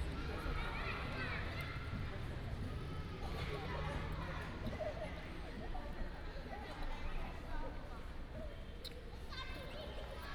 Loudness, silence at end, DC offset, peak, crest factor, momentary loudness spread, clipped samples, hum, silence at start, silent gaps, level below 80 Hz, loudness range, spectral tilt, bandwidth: -46 LUFS; 0 s; under 0.1%; -30 dBFS; 14 dB; 8 LU; under 0.1%; none; 0 s; none; -46 dBFS; 5 LU; -6 dB/octave; 17.5 kHz